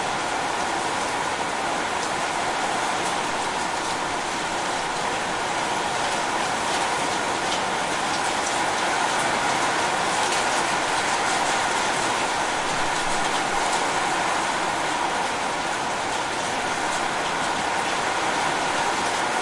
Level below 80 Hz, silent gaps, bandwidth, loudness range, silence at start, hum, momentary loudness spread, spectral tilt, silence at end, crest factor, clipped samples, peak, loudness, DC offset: -52 dBFS; none; 11.5 kHz; 3 LU; 0 s; none; 3 LU; -2 dB/octave; 0 s; 14 dB; under 0.1%; -10 dBFS; -23 LUFS; under 0.1%